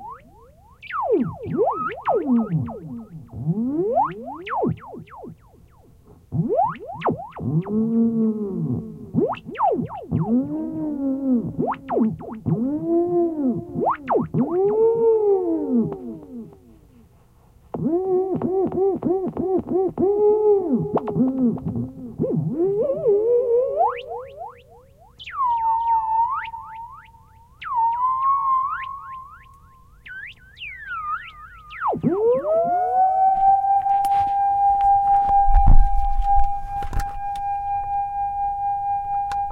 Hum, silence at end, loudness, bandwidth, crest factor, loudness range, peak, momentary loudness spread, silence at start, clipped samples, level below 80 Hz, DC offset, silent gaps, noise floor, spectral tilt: none; 0 s; -22 LUFS; 4.7 kHz; 20 dB; 7 LU; -2 dBFS; 17 LU; 0 s; under 0.1%; -30 dBFS; under 0.1%; none; -53 dBFS; -9 dB/octave